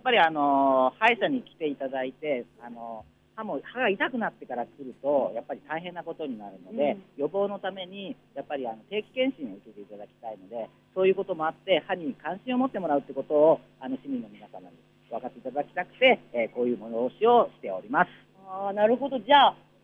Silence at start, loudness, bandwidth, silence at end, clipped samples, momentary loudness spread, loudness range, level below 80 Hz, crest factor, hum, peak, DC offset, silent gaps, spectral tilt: 0.05 s; -27 LUFS; 6.6 kHz; 0.3 s; under 0.1%; 19 LU; 7 LU; -72 dBFS; 20 dB; none; -6 dBFS; under 0.1%; none; -6.5 dB/octave